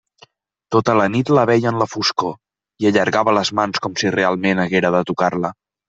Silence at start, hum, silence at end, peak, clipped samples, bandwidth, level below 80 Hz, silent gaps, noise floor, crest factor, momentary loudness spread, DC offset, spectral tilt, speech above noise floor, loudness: 0.7 s; none; 0.35 s; -2 dBFS; under 0.1%; 8.2 kHz; -58 dBFS; none; -52 dBFS; 18 dB; 5 LU; under 0.1%; -5 dB/octave; 35 dB; -17 LUFS